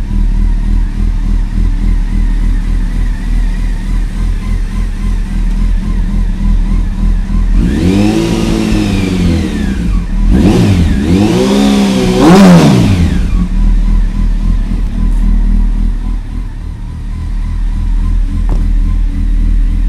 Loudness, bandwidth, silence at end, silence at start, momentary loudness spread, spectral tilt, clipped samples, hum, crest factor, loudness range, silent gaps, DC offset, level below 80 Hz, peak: -12 LUFS; 12 kHz; 0 s; 0 s; 10 LU; -7 dB/octave; 0.6%; none; 10 dB; 9 LU; none; under 0.1%; -12 dBFS; 0 dBFS